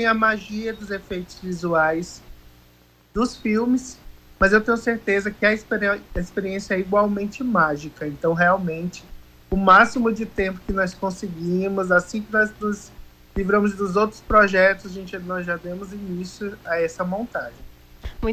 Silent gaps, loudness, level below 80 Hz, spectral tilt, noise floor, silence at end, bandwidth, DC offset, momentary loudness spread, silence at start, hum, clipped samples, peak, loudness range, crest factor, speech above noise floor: none; -22 LUFS; -42 dBFS; -6 dB/octave; -54 dBFS; 0 s; 16 kHz; under 0.1%; 15 LU; 0 s; 60 Hz at -50 dBFS; under 0.1%; -2 dBFS; 5 LU; 20 dB; 33 dB